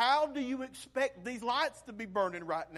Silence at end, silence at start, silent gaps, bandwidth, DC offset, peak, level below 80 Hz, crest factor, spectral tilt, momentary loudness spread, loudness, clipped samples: 0 s; 0 s; none; 13.5 kHz; under 0.1%; -18 dBFS; -68 dBFS; 16 dB; -3.5 dB/octave; 8 LU; -34 LUFS; under 0.1%